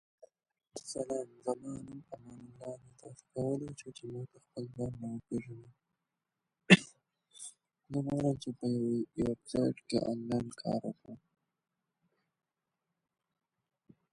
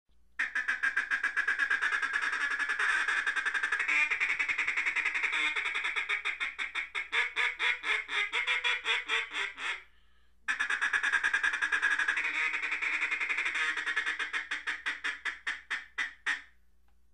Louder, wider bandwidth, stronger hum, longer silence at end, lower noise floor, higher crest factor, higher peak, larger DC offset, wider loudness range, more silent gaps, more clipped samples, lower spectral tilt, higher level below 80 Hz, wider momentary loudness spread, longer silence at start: second, -35 LUFS vs -30 LUFS; about the same, 11.5 kHz vs 11 kHz; neither; first, 2.95 s vs 0.7 s; first, -88 dBFS vs -69 dBFS; first, 32 dB vs 18 dB; first, -6 dBFS vs -14 dBFS; neither; first, 11 LU vs 3 LU; neither; neither; first, -5.5 dB/octave vs 1 dB/octave; about the same, -66 dBFS vs -66 dBFS; first, 17 LU vs 7 LU; first, 0.75 s vs 0.4 s